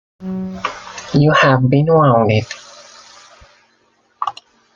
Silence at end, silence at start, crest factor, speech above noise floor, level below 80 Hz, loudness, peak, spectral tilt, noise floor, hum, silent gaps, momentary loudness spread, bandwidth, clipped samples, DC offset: 0.45 s; 0.2 s; 16 dB; 46 dB; -50 dBFS; -15 LUFS; 0 dBFS; -7 dB/octave; -58 dBFS; none; none; 16 LU; 7.4 kHz; under 0.1%; under 0.1%